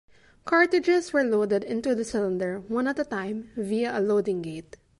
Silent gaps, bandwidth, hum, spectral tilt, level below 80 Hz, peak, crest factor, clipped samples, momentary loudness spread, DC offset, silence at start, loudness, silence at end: none; 11.5 kHz; none; -5.5 dB/octave; -60 dBFS; -8 dBFS; 18 dB; under 0.1%; 11 LU; under 0.1%; 0.45 s; -26 LUFS; 0.4 s